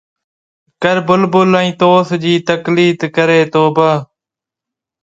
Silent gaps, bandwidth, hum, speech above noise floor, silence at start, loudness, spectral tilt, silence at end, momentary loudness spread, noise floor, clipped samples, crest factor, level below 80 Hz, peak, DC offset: none; 7.8 kHz; none; 74 dB; 0.8 s; -12 LUFS; -6.5 dB/octave; 1 s; 4 LU; -86 dBFS; under 0.1%; 14 dB; -56 dBFS; 0 dBFS; under 0.1%